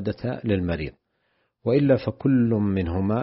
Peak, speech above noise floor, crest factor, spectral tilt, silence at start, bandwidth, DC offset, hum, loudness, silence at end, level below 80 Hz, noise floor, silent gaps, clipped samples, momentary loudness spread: -8 dBFS; 48 dB; 16 dB; -8 dB/octave; 0 s; 5.8 kHz; under 0.1%; none; -23 LUFS; 0 s; -46 dBFS; -71 dBFS; none; under 0.1%; 10 LU